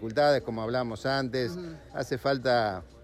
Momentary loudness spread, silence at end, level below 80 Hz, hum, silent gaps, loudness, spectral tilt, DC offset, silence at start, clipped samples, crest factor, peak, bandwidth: 11 LU; 0 s; -54 dBFS; none; none; -29 LUFS; -6 dB/octave; under 0.1%; 0 s; under 0.1%; 16 dB; -12 dBFS; 14.5 kHz